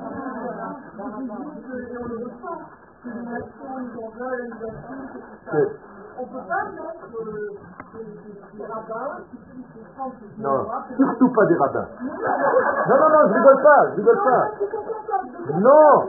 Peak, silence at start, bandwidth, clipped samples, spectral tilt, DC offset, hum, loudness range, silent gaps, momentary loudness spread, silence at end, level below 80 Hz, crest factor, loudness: 0 dBFS; 0 s; 2.2 kHz; under 0.1%; -1.5 dB/octave; under 0.1%; none; 16 LU; none; 23 LU; 0 s; -62 dBFS; 20 dB; -20 LUFS